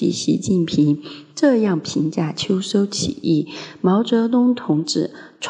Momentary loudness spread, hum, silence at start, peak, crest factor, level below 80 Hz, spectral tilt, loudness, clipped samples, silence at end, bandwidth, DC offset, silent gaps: 6 LU; none; 0 s; -4 dBFS; 16 dB; -56 dBFS; -5.5 dB/octave; -19 LUFS; under 0.1%; 0 s; 10.5 kHz; under 0.1%; none